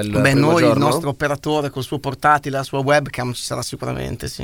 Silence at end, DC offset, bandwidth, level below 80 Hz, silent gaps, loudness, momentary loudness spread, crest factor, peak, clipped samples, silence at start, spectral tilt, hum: 0 s; 0.2%; 18 kHz; -44 dBFS; none; -19 LUFS; 11 LU; 18 dB; 0 dBFS; under 0.1%; 0 s; -5.5 dB/octave; none